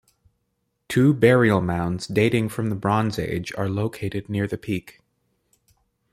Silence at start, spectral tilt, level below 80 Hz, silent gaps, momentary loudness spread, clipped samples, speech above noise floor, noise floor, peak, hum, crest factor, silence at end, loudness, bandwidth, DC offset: 0.9 s; -7 dB/octave; -52 dBFS; none; 11 LU; under 0.1%; 53 dB; -74 dBFS; -2 dBFS; none; 20 dB; 1.2 s; -22 LUFS; 15.5 kHz; under 0.1%